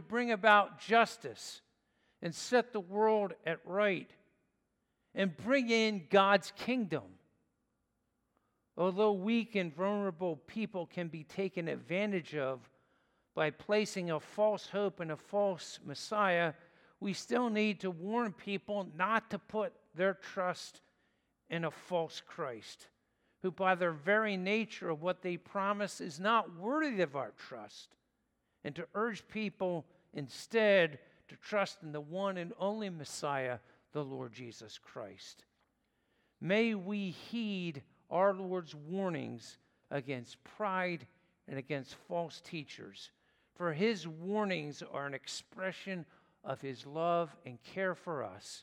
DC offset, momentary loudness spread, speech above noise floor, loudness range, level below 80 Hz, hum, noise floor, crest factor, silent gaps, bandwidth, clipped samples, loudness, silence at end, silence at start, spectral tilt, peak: under 0.1%; 16 LU; 46 dB; 8 LU; -82 dBFS; none; -82 dBFS; 26 dB; none; 15 kHz; under 0.1%; -35 LUFS; 0 s; 0 s; -5 dB/octave; -12 dBFS